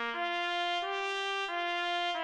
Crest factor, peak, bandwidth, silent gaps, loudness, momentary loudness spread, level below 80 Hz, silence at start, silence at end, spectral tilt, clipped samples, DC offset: 14 dB; -20 dBFS; 10.5 kHz; none; -32 LUFS; 1 LU; -74 dBFS; 0 s; 0 s; 0 dB/octave; under 0.1%; under 0.1%